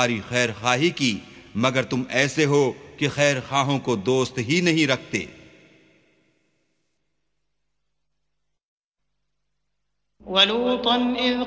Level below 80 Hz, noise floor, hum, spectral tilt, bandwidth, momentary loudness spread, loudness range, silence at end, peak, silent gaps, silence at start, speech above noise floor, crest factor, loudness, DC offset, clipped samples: -58 dBFS; -80 dBFS; none; -4 dB/octave; 8 kHz; 8 LU; 6 LU; 0 s; -2 dBFS; 8.63-8.78 s, 8.84-8.92 s; 0 s; 58 dB; 22 dB; -22 LUFS; under 0.1%; under 0.1%